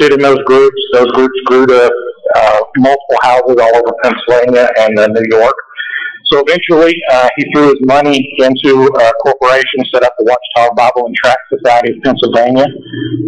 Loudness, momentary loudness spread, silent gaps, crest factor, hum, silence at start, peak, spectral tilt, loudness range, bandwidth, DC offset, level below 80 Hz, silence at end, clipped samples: -9 LUFS; 5 LU; none; 8 dB; none; 0 s; -2 dBFS; -5 dB/octave; 1 LU; 9.8 kHz; under 0.1%; -46 dBFS; 0 s; under 0.1%